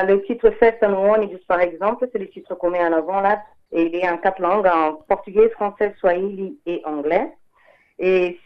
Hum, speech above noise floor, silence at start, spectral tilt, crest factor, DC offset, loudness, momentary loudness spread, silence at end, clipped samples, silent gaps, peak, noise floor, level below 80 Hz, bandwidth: none; 37 dB; 0 s; -8 dB/octave; 18 dB; under 0.1%; -20 LUFS; 10 LU; 0.1 s; under 0.1%; none; 0 dBFS; -56 dBFS; -50 dBFS; 5.8 kHz